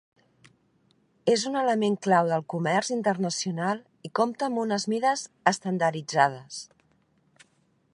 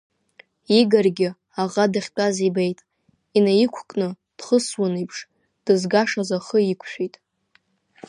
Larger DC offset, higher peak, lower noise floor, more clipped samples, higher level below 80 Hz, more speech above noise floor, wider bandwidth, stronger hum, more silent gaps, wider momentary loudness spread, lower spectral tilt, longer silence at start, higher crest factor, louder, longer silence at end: neither; about the same, -4 dBFS vs -4 dBFS; first, -68 dBFS vs -64 dBFS; neither; second, -78 dBFS vs -72 dBFS; about the same, 42 dB vs 43 dB; about the same, 11.5 kHz vs 11 kHz; neither; neither; second, 8 LU vs 12 LU; about the same, -4.5 dB/octave vs -5 dB/octave; first, 1.25 s vs 0.7 s; first, 24 dB vs 18 dB; second, -26 LUFS vs -21 LUFS; first, 1.3 s vs 1 s